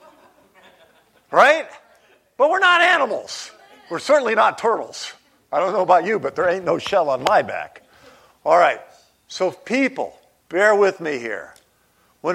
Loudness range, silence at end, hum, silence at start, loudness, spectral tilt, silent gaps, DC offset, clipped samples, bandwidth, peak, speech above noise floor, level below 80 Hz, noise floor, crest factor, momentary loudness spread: 3 LU; 0 s; none; 1.3 s; -18 LUFS; -3.5 dB/octave; none; under 0.1%; under 0.1%; 14 kHz; 0 dBFS; 42 dB; -66 dBFS; -60 dBFS; 20 dB; 17 LU